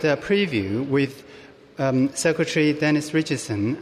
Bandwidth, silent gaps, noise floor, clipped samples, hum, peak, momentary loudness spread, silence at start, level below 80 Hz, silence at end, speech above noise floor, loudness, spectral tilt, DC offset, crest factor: 14.5 kHz; none; -46 dBFS; under 0.1%; none; -8 dBFS; 6 LU; 0 s; -60 dBFS; 0 s; 24 dB; -22 LUFS; -5.5 dB/octave; under 0.1%; 14 dB